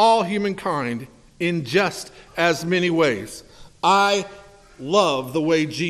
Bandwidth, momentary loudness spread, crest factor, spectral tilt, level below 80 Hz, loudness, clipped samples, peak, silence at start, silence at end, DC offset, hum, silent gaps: 14 kHz; 15 LU; 18 dB; -4.5 dB/octave; -56 dBFS; -21 LUFS; under 0.1%; -4 dBFS; 0 s; 0 s; under 0.1%; none; none